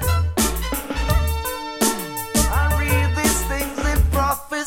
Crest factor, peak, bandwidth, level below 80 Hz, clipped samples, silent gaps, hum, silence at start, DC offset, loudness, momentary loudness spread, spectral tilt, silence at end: 16 dB; -4 dBFS; 17 kHz; -24 dBFS; under 0.1%; none; none; 0 s; under 0.1%; -21 LUFS; 6 LU; -4 dB/octave; 0 s